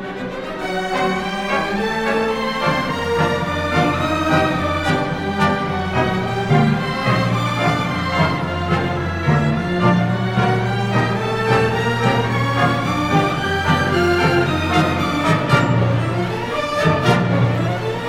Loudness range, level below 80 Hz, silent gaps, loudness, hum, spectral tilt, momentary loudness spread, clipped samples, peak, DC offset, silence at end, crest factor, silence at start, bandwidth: 2 LU; -40 dBFS; none; -18 LUFS; none; -6.5 dB/octave; 5 LU; under 0.1%; -2 dBFS; under 0.1%; 0 s; 16 dB; 0 s; 15 kHz